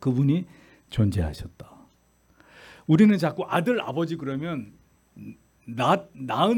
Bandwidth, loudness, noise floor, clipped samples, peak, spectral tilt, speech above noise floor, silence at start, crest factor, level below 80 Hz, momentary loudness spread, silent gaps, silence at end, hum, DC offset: 17.5 kHz; -24 LUFS; -62 dBFS; under 0.1%; -6 dBFS; -7.5 dB/octave; 38 dB; 0 s; 18 dB; -50 dBFS; 24 LU; none; 0 s; none; under 0.1%